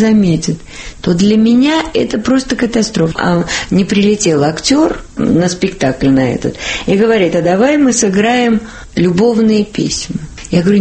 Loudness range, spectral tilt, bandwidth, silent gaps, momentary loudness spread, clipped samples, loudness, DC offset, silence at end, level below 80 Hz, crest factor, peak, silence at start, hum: 1 LU; -5 dB/octave; 8.8 kHz; none; 8 LU; under 0.1%; -12 LUFS; under 0.1%; 0 s; -36 dBFS; 12 dB; 0 dBFS; 0 s; none